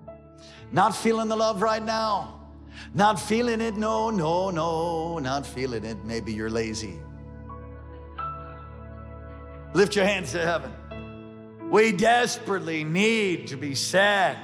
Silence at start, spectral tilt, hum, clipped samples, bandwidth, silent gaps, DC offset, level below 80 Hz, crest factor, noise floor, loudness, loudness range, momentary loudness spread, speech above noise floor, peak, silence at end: 0 s; -4.5 dB/octave; none; under 0.1%; 15 kHz; none; under 0.1%; -48 dBFS; 16 dB; -47 dBFS; -25 LUFS; 9 LU; 21 LU; 22 dB; -10 dBFS; 0 s